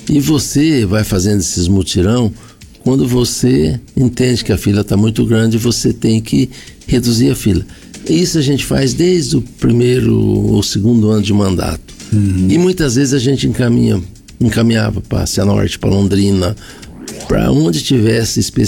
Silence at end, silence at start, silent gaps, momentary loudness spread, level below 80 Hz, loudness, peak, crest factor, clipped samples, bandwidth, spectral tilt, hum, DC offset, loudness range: 0 s; 0 s; none; 6 LU; -32 dBFS; -13 LUFS; -4 dBFS; 10 dB; under 0.1%; 18.5 kHz; -5.5 dB/octave; none; under 0.1%; 2 LU